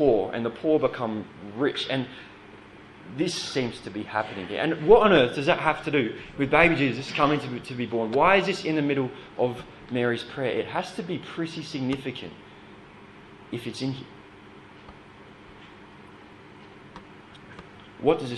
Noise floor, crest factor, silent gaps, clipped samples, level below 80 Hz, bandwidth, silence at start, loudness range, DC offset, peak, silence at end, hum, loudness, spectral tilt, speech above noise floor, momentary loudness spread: -48 dBFS; 24 dB; none; under 0.1%; -56 dBFS; 12 kHz; 0 s; 17 LU; under 0.1%; -2 dBFS; 0 s; none; -25 LUFS; -5.5 dB/octave; 23 dB; 24 LU